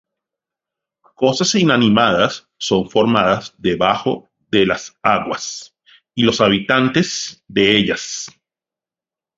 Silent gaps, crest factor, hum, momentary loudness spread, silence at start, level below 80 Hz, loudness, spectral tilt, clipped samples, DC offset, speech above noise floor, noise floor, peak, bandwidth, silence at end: none; 18 dB; none; 12 LU; 1.2 s; -50 dBFS; -16 LUFS; -4 dB/octave; under 0.1%; under 0.1%; 73 dB; -90 dBFS; 0 dBFS; 7.8 kHz; 1.1 s